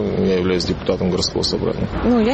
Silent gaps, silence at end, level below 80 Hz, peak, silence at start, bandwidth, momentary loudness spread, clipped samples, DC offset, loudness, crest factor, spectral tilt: none; 0 s; -34 dBFS; -4 dBFS; 0 s; 8.8 kHz; 4 LU; under 0.1%; under 0.1%; -19 LUFS; 14 dB; -5.5 dB/octave